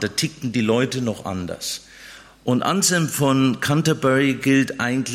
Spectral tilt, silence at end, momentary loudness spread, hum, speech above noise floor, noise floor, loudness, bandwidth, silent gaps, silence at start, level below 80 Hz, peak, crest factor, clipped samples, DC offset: -4.5 dB/octave; 0 s; 11 LU; none; 23 dB; -43 dBFS; -20 LUFS; 16 kHz; none; 0 s; -56 dBFS; -6 dBFS; 16 dB; under 0.1%; under 0.1%